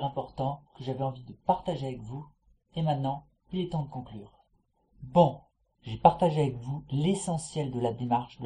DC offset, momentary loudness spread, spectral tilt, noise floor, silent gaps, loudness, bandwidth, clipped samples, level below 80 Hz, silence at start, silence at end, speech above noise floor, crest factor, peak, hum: under 0.1%; 18 LU; -7 dB/octave; -71 dBFS; none; -30 LUFS; 10.5 kHz; under 0.1%; -56 dBFS; 0 s; 0 s; 42 dB; 26 dB; -4 dBFS; none